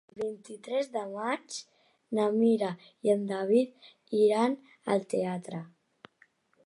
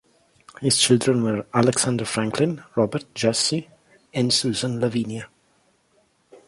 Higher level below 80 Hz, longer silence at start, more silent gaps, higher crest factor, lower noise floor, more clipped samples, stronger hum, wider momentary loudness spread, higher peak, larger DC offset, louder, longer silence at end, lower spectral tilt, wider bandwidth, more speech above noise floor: second, -82 dBFS vs -58 dBFS; second, 0.15 s vs 0.6 s; neither; about the same, 18 dB vs 18 dB; about the same, -66 dBFS vs -64 dBFS; neither; neither; about the same, 12 LU vs 10 LU; second, -14 dBFS vs -4 dBFS; neither; second, -30 LUFS vs -22 LUFS; first, 1 s vs 0.1 s; first, -6 dB/octave vs -4 dB/octave; about the same, 11.5 kHz vs 11.5 kHz; second, 37 dB vs 42 dB